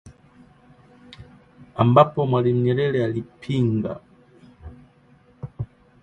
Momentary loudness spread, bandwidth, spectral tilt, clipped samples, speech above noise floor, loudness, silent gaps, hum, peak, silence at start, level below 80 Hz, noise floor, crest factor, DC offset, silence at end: 21 LU; 7.6 kHz; -9 dB/octave; under 0.1%; 35 dB; -21 LUFS; none; none; -2 dBFS; 0.05 s; -52 dBFS; -55 dBFS; 22 dB; under 0.1%; 0.35 s